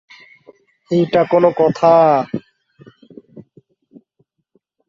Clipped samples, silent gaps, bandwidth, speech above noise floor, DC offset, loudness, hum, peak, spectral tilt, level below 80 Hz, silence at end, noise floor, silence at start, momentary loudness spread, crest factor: under 0.1%; none; 7.4 kHz; 51 dB; under 0.1%; -14 LUFS; none; -2 dBFS; -8 dB/octave; -60 dBFS; 1.45 s; -64 dBFS; 0.9 s; 11 LU; 16 dB